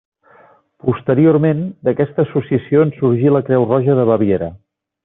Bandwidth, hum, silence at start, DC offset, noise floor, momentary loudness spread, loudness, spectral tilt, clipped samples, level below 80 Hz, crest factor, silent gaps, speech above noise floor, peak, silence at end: 3.9 kHz; none; 0.85 s; under 0.1%; -49 dBFS; 7 LU; -15 LUFS; -9 dB/octave; under 0.1%; -54 dBFS; 14 dB; none; 35 dB; -2 dBFS; 0.5 s